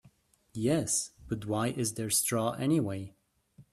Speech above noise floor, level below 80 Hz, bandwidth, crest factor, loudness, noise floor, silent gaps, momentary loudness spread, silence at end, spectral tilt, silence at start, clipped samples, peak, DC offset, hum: 33 dB; -62 dBFS; 15.5 kHz; 18 dB; -31 LUFS; -64 dBFS; none; 11 LU; 0.1 s; -4.5 dB/octave; 0.05 s; under 0.1%; -14 dBFS; under 0.1%; none